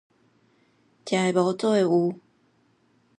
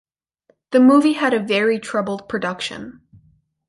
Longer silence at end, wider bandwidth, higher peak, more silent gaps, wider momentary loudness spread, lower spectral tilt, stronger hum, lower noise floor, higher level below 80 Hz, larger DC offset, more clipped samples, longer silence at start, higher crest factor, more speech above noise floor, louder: first, 1.05 s vs 0.75 s; about the same, 11 kHz vs 11.5 kHz; second, -8 dBFS vs -4 dBFS; neither; about the same, 16 LU vs 15 LU; about the same, -6 dB/octave vs -5 dB/octave; neither; about the same, -65 dBFS vs -62 dBFS; second, -76 dBFS vs -62 dBFS; neither; neither; first, 1.05 s vs 0.7 s; about the same, 18 dB vs 16 dB; about the same, 42 dB vs 45 dB; second, -23 LUFS vs -18 LUFS